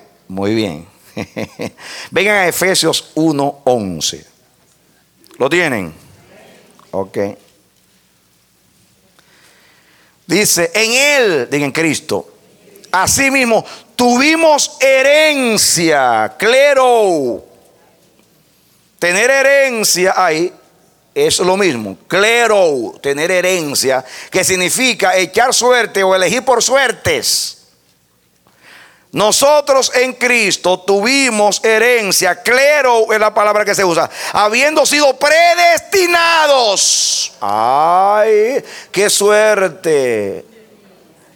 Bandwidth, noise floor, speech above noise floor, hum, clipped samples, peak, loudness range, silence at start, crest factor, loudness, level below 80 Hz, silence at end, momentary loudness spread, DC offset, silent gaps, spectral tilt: 18.5 kHz; -56 dBFS; 43 dB; none; under 0.1%; 0 dBFS; 9 LU; 0.3 s; 14 dB; -12 LUFS; -54 dBFS; 0.95 s; 12 LU; under 0.1%; none; -2 dB/octave